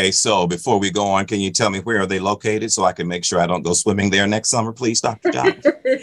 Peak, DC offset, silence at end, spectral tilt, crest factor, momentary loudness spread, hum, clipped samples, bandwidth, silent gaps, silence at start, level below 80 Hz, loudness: -2 dBFS; under 0.1%; 0 s; -3.5 dB/octave; 16 dB; 4 LU; none; under 0.1%; 12.5 kHz; none; 0 s; -54 dBFS; -18 LUFS